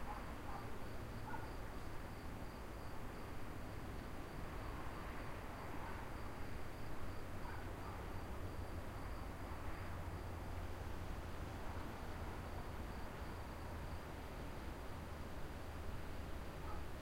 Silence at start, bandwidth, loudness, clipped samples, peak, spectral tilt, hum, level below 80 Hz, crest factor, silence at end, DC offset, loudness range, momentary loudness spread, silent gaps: 0 s; 16 kHz; -50 LUFS; under 0.1%; -34 dBFS; -6 dB/octave; none; -52 dBFS; 12 dB; 0 s; under 0.1%; 1 LU; 2 LU; none